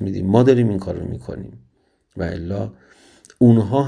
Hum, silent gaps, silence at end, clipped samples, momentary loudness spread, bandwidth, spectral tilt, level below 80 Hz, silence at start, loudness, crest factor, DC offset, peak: none; none; 0 s; under 0.1%; 19 LU; 10 kHz; -9 dB/octave; -46 dBFS; 0 s; -18 LUFS; 18 dB; under 0.1%; 0 dBFS